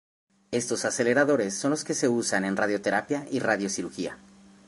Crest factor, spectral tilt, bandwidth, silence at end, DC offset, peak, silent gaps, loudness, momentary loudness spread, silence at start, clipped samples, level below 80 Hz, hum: 18 dB; -4 dB/octave; 11.5 kHz; 0.5 s; under 0.1%; -8 dBFS; none; -26 LUFS; 9 LU; 0.5 s; under 0.1%; -68 dBFS; none